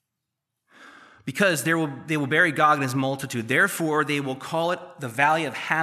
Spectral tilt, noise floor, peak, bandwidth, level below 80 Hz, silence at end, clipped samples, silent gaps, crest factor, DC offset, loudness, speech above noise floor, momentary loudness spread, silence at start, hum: -4.5 dB/octave; -83 dBFS; -6 dBFS; 15 kHz; -74 dBFS; 0 s; under 0.1%; none; 20 dB; under 0.1%; -23 LUFS; 59 dB; 9 LU; 0.8 s; none